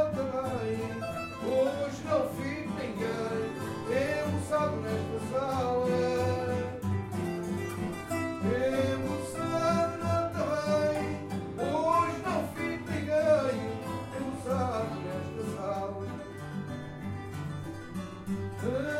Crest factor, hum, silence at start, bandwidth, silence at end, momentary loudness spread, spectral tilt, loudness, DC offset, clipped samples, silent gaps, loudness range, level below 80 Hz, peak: 18 dB; none; 0 s; 16 kHz; 0 s; 10 LU; -6.5 dB/octave; -32 LUFS; under 0.1%; under 0.1%; none; 6 LU; -56 dBFS; -14 dBFS